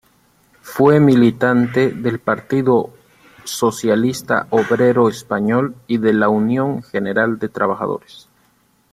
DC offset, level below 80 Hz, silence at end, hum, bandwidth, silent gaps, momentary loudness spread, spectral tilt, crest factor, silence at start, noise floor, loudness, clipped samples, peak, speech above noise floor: under 0.1%; -56 dBFS; 0.95 s; none; 15.5 kHz; none; 9 LU; -6.5 dB/octave; 16 dB; 0.65 s; -58 dBFS; -16 LUFS; under 0.1%; 0 dBFS; 42 dB